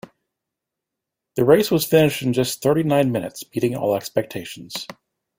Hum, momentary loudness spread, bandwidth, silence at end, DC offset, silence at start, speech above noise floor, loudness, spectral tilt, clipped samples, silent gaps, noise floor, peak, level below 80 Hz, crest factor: none; 15 LU; 16.5 kHz; 0.45 s; under 0.1%; 1.35 s; 64 dB; -20 LUFS; -5.5 dB/octave; under 0.1%; none; -84 dBFS; -2 dBFS; -56 dBFS; 20 dB